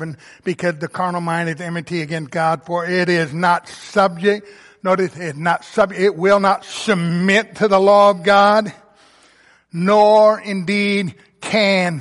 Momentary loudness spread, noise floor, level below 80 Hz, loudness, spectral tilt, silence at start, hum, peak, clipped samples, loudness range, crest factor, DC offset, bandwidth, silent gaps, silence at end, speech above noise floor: 12 LU; -52 dBFS; -60 dBFS; -16 LUFS; -5.5 dB/octave; 0 s; none; -2 dBFS; under 0.1%; 5 LU; 14 dB; under 0.1%; 11.5 kHz; none; 0 s; 36 dB